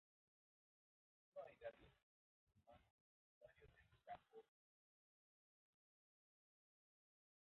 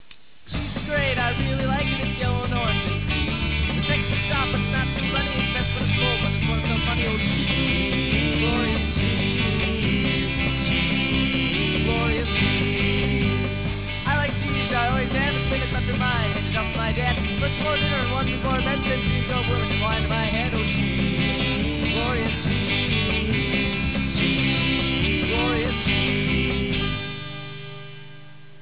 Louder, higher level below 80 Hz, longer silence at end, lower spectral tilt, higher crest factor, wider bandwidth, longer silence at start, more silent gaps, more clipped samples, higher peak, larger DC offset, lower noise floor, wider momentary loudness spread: second, -61 LUFS vs -22 LUFS; second, -88 dBFS vs -32 dBFS; first, 3 s vs 0.3 s; second, -3 dB/octave vs -9.5 dB/octave; first, 24 dB vs 14 dB; about the same, 4 kHz vs 4 kHz; first, 1.35 s vs 0.45 s; first, 2.03-2.47 s, 2.90-3.41 s vs none; neither; second, -44 dBFS vs -10 dBFS; second, under 0.1% vs 0.9%; first, under -90 dBFS vs -50 dBFS; first, 10 LU vs 3 LU